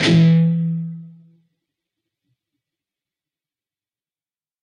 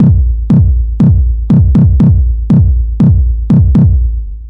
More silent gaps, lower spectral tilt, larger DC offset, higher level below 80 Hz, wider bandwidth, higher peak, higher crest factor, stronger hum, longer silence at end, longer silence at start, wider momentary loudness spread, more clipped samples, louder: neither; second, -7 dB/octave vs -12 dB/octave; neither; second, -62 dBFS vs -12 dBFS; first, 9.2 kHz vs 3.4 kHz; second, -4 dBFS vs 0 dBFS; first, 18 dB vs 8 dB; neither; first, 3.55 s vs 0 s; about the same, 0 s vs 0 s; first, 19 LU vs 5 LU; neither; second, -16 LUFS vs -9 LUFS